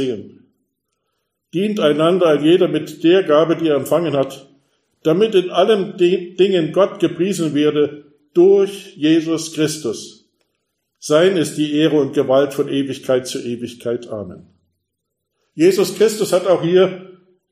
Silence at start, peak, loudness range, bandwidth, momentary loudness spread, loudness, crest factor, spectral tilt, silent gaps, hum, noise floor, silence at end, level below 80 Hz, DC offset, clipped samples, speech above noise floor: 0 s; -2 dBFS; 4 LU; 15.5 kHz; 12 LU; -16 LUFS; 16 dB; -5.5 dB/octave; none; none; -76 dBFS; 0.4 s; -66 dBFS; under 0.1%; under 0.1%; 60 dB